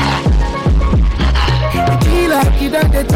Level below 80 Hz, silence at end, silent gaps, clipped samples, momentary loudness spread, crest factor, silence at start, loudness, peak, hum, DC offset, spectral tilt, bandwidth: -14 dBFS; 0 s; none; under 0.1%; 3 LU; 6 dB; 0 s; -14 LUFS; -6 dBFS; none; under 0.1%; -6 dB/octave; 16 kHz